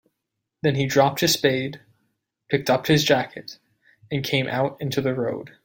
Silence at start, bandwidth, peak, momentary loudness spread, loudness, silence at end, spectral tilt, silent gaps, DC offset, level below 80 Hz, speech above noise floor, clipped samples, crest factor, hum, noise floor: 0.65 s; 17 kHz; -4 dBFS; 12 LU; -22 LUFS; 0.15 s; -4.5 dB/octave; none; under 0.1%; -58 dBFS; 59 dB; under 0.1%; 20 dB; none; -81 dBFS